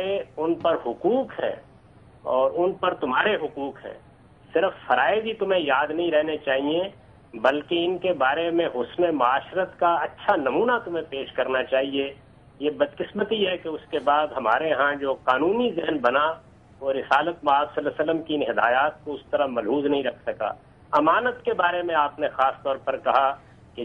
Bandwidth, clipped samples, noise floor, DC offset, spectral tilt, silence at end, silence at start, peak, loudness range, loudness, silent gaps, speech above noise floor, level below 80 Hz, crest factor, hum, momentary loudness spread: 6.4 kHz; under 0.1%; -51 dBFS; under 0.1%; -6.5 dB/octave; 0 s; 0 s; -6 dBFS; 2 LU; -24 LUFS; none; 28 dB; -60 dBFS; 18 dB; none; 9 LU